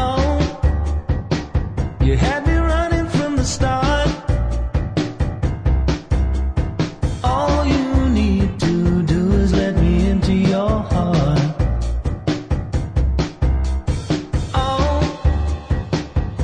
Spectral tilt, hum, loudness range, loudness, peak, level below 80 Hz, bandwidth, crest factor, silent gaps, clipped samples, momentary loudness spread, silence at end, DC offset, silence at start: -7 dB/octave; none; 4 LU; -19 LUFS; -4 dBFS; -22 dBFS; 10 kHz; 14 dB; none; under 0.1%; 6 LU; 0 s; under 0.1%; 0 s